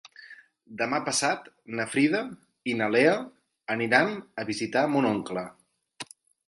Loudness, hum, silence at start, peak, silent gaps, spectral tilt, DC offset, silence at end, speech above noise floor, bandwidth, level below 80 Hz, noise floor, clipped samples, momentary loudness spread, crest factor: -26 LUFS; none; 0.05 s; -6 dBFS; none; -4 dB/octave; under 0.1%; 0.45 s; 24 dB; 11.5 kHz; -72 dBFS; -51 dBFS; under 0.1%; 20 LU; 22 dB